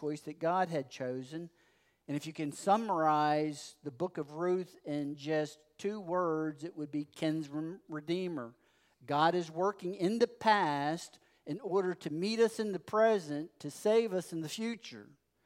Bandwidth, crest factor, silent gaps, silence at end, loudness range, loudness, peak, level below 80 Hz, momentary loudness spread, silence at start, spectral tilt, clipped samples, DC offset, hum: 16 kHz; 22 dB; none; 0.4 s; 4 LU; -34 LUFS; -14 dBFS; -84 dBFS; 14 LU; 0 s; -5.5 dB/octave; under 0.1%; under 0.1%; none